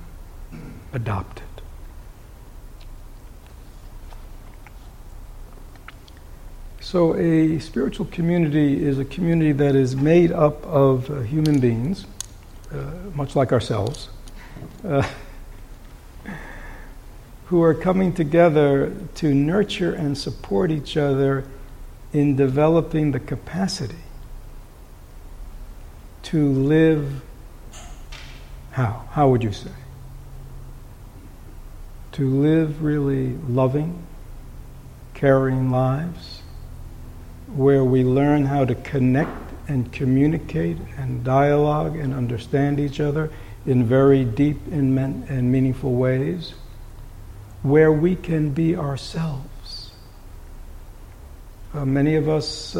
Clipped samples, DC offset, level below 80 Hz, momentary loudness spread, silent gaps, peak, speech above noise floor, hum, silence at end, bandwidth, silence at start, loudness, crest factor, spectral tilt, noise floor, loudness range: under 0.1%; under 0.1%; -38 dBFS; 24 LU; none; -4 dBFS; 22 dB; none; 0 s; 16 kHz; 0 s; -21 LUFS; 18 dB; -7.5 dB/octave; -42 dBFS; 8 LU